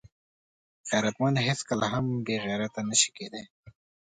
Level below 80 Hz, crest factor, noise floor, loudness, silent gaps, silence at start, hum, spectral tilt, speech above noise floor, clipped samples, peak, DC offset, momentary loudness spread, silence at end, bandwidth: -62 dBFS; 22 dB; under -90 dBFS; -27 LUFS; 3.50-3.63 s; 0.85 s; none; -3.5 dB/octave; over 62 dB; under 0.1%; -8 dBFS; under 0.1%; 16 LU; 0.45 s; 9.6 kHz